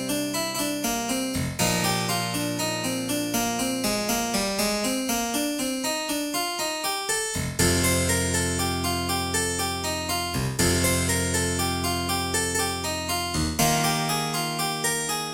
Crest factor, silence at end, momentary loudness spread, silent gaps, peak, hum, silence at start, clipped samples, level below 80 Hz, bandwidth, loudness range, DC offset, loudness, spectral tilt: 18 dB; 0 s; 5 LU; none; -8 dBFS; none; 0 s; under 0.1%; -44 dBFS; 17 kHz; 1 LU; under 0.1%; -24 LUFS; -3 dB/octave